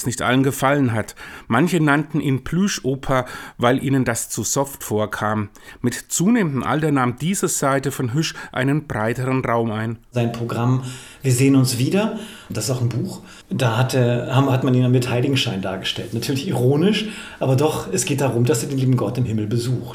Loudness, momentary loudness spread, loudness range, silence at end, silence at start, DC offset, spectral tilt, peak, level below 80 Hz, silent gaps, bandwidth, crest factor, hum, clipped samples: -20 LUFS; 8 LU; 2 LU; 0 s; 0 s; under 0.1%; -5.5 dB/octave; 0 dBFS; -48 dBFS; none; 17.5 kHz; 18 dB; none; under 0.1%